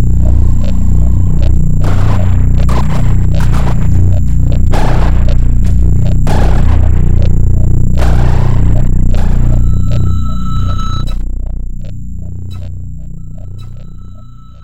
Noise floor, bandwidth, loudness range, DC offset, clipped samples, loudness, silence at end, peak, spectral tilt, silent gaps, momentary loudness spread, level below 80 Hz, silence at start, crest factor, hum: -32 dBFS; 8.2 kHz; 9 LU; 30%; 2%; -12 LUFS; 0 s; 0 dBFS; -8 dB/octave; none; 14 LU; -12 dBFS; 0 s; 8 dB; 60 Hz at -20 dBFS